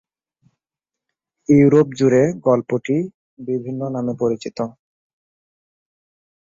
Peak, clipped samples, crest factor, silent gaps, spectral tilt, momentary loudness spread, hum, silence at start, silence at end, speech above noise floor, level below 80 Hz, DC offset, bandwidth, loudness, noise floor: -2 dBFS; under 0.1%; 18 dB; 3.14-3.37 s; -8 dB/octave; 15 LU; none; 1.5 s; 1.75 s; 70 dB; -58 dBFS; under 0.1%; 7.6 kHz; -18 LUFS; -87 dBFS